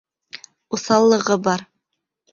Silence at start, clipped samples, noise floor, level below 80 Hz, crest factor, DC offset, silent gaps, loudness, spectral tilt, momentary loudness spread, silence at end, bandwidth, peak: 0.35 s; under 0.1%; -78 dBFS; -62 dBFS; 18 dB; under 0.1%; none; -18 LUFS; -4.5 dB/octave; 23 LU; 0.7 s; 7.4 kHz; -2 dBFS